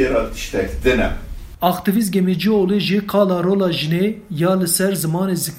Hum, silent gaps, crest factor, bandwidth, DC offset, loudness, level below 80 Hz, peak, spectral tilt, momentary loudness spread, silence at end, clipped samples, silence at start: none; none; 18 dB; 16.5 kHz; under 0.1%; -18 LUFS; -32 dBFS; 0 dBFS; -5 dB/octave; 6 LU; 0 s; under 0.1%; 0 s